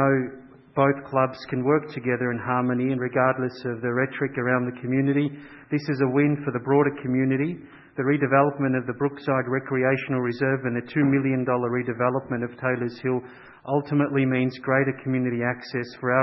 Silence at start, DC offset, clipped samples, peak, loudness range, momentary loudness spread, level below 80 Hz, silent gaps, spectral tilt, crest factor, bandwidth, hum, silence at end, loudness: 0 s; under 0.1%; under 0.1%; -4 dBFS; 2 LU; 7 LU; -64 dBFS; none; -10 dB/octave; 20 dB; 6 kHz; none; 0 s; -24 LUFS